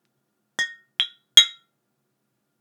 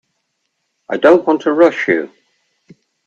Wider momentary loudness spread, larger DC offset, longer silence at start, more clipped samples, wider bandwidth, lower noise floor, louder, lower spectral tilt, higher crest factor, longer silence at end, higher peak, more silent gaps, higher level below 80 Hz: about the same, 14 LU vs 12 LU; neither; second, 0.6 s vs 0.9 s; neither; first, over 20 kHz vs 7.4 kHz; first, -75 dBFS vs -70 dBFS; second, -19 LUFS vs -13 LUFS; second, 3.5 dB/octave vs -6 dB/octave; first, 26 dB vs 16 dB; about the same, 1.1 s vs 1 s; about the same, 0 dBFS vs 0 dBFS; neither; second, -70 dBFS vs -64 dBFS